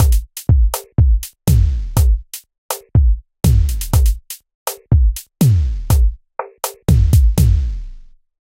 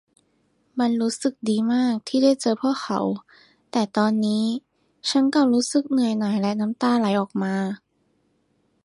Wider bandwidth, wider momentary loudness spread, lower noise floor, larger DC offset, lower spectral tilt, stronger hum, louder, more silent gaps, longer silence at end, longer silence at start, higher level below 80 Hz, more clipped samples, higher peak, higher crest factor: first, 16.5 kHz vs 11.5 kHz; first, 13 LU vs 8 LU; second, -37 dBFS vs -67 dBFS; neither; about the same, -6 dB/octave vs -5 dB/octave; neither; first, -17 LUFS vs -22 LUFS; first, 2.58-2.69 s, 4.55-4.66 s vs none; second, 0.5 s vs 1.1 s; second, 0 s vs 0.75 s; first, -16 dBFS vs -70 dBFS; neither; first, -2 dBFS vs -6 dBFS; about the same, 14 dB vs 16 dB